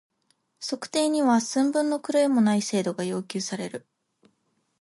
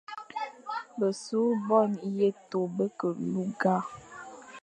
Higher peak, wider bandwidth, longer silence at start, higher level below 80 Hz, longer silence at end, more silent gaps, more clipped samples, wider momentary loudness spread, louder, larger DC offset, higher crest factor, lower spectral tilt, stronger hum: about the same, -12 dBFS vs -10 dBFS; about the same, 11.5 kHz vs 10.5 kHz; first, 0.6 s vs 0.1 s; about the same, -76 dBFS vs -74 dBFS; first, 1 s vs 0.05 s; neither; neither; second, 12 LU vs 16 LU; first, -25 LUFS vs -30 LUFS; neither; second, 14 dB vs 20 dB; second, -4.5 dB/octave vs -6.5 dB/octave; neither